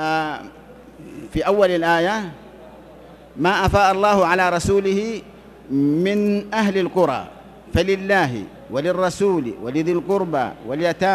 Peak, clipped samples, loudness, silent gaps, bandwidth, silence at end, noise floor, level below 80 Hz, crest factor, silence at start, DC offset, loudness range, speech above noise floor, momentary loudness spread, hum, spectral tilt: -2 dBFS; under 0.1%; -19 LUFS; none; 14 kHz; 0 s; -43 dBFS; -42 dBFS; 18 dB; 0 s; under 0.1%; 3 LU; 24 dB; 12 LU; none; -5.5 dB/octave